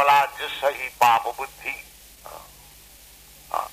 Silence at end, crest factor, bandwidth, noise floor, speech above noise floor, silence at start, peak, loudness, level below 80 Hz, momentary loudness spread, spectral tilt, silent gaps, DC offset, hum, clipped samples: 0 s; 22 dB; 15.5 kHz; -48 dBFS; 24 dB; 0 s; -2 dBFS; -23 LUFS; -56 dBFS; 24 LU; -1.5 dB/octave; none; under 0.1%; none; under 0.1%